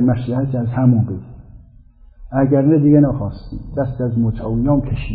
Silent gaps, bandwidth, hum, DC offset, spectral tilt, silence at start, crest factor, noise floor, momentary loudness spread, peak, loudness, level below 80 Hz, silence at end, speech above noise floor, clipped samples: none; 4.9 kHz; none; under 0.1%; -14 dB/octave; 0 s; 16 dB; -44 dBFS; 12 LU; -2 dBFS; -17 LUFS; -34 dBFS; 0 s; 29 dB; under 0.1%